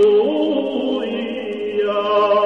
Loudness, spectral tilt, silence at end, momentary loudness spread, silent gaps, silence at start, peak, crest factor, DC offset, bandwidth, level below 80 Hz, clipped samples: -19 LUFS; -6 dB/octave; 0 s; 9 LU; none; 0 s; -6 dBFS; 12 dB; 0.2%; 6 kHz; -68 dBFS; under 0.1%